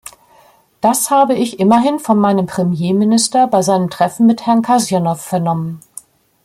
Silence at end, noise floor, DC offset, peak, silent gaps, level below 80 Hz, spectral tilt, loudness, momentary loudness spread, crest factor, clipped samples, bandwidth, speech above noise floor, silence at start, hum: 0.65 s; -49 dBFS; under 0.1%; 0 dBFS; none; -58 dBFS; -5.5 dB/octave; -14 LUFS; 6 LU; 14 dB; under 0.1%; 15.5 kHz; 36 dB; 0.85 s; none